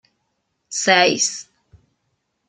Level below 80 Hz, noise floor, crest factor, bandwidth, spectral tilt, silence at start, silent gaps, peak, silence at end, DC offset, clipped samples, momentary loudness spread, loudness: -66 dBFS; -72 dBFS; 22 dB; 11 kHz; -1.5 dB/octave; 0.7 s; none; -2 dBFS; 1.05 s; under 0.1%; under 0.1%; 15 LU; -17 LUFS